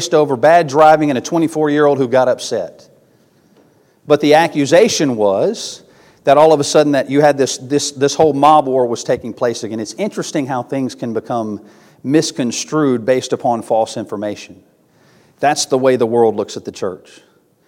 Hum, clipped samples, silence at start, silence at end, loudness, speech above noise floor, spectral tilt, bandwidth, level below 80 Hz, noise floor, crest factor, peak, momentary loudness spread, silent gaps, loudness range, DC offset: none; under 0.1%; 0 s; 0.7 s; -14 LUFS; 38 dB; -4.5 dB/octave; 16 kHz; -62 dBFS; -52 dBFS; 14 dB; 0 dBFS; 13 LU; none; 6 LU; under 0.1%